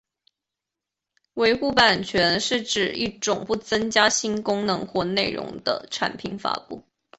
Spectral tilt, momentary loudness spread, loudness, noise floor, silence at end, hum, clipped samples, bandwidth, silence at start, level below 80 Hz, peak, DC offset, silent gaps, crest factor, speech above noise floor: -2.5 dB/octave; 10 LU; -23 LUFS; -87 dBFS; 0.4 s; none; under 0.1%; 8.4 kHz; 1.35 s; -56 dBFS; -2 dBFS; under 0.1%; none; 22 dB; 63 dB